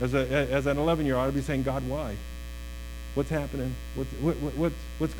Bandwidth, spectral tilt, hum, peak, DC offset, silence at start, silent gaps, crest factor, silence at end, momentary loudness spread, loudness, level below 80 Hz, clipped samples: 18 kHz; -6.5 dB/octave; none; -12 dBFS; under 0.1%; 0 s; none; 16 dB; 0 s; 14 LU; -29 LUFS; -38 dBFS; under 0.1%